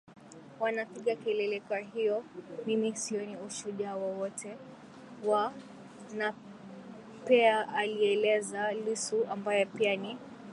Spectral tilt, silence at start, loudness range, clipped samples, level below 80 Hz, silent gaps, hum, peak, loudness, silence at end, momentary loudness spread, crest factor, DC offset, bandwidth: -3.5 dB/octave; 0.1 s; 7 LU; under 0.1%; -80 dBFS; none; none; -12 dBFS; -32 LUFS; 0 s; 21 LU; 20 dB; under 0.1%; 11.5 kHz